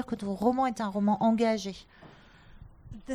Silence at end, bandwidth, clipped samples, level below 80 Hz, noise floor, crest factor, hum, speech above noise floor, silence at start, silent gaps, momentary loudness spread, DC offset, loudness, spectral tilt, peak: 0 s; 11 kHz; under 0.1%; -56 dBFS; -53 dBFS; 16 dB; none; 25 dB; 0 s; none; 21 LU; under 0.1%; -28 LUFS; -6.5 dB/octave; -14 dBFS